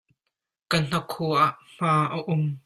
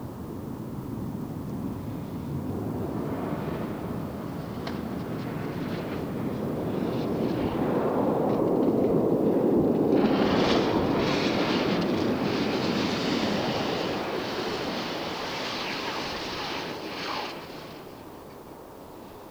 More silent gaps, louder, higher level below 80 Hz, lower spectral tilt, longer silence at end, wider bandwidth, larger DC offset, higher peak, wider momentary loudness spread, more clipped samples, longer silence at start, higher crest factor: neither; first, -25 LUFS vs -28 LUFS; second, -60 dBFS vs -52 dBFS; about the same, -6 dB/octave vs -6 dB/octave; about the same, 0.05 s vs 0 s; second, 14 kHz vs 20 kHz; neither; first, -6 dBFS vs -10 dBFS; second, 5 LU vs 13 LU; neither; first, 0.7 s vs 0 s; about the same, 20 dB vs 18 dB